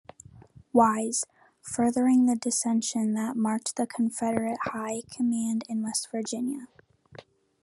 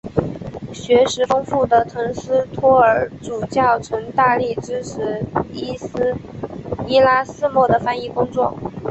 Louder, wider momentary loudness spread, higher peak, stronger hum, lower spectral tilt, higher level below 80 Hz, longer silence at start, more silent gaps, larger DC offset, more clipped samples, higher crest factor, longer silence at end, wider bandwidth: second, -27 LUFS vs -18 LUFS; second, 11 LU vs 14 LU; second, -8 dBFS vs -2 dBFS; neither; second, -4 dB/octave vs -5.5 dB/octave; second, -70 dBFS vs -46 dBFS; first, 0.35 s vs 0.05 s; neither; neither; neither; about the same, 20 dB vs 16 dB; first, 0.4 s vs 0 s; first, 12.5 kHz vs 8.2 kHz